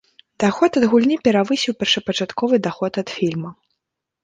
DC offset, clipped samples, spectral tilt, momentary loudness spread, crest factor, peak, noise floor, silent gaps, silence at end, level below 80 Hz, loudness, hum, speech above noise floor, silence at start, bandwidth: under 0.1%; under 0.1%; -5 dB/octave; 8 LU; 16 dB; -2 dBFS; -79 dBFS; none; 0.7 s; -60 dBFS; -19 LUFS; none; 61 dB; 0.4 s; 9.4 kHz